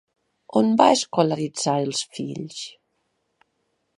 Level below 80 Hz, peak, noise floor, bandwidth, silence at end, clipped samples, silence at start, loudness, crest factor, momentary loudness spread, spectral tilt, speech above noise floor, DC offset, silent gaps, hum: -72 dBFS; -2 dBFS; -73 dBFS; 11.5 kHz; 1.3 s; under 0.1%; 0.5 s; -22 LUFS; 22 dB; 16 LU; -4.5 dB/octave; 51 dB; under 0.1%; none; none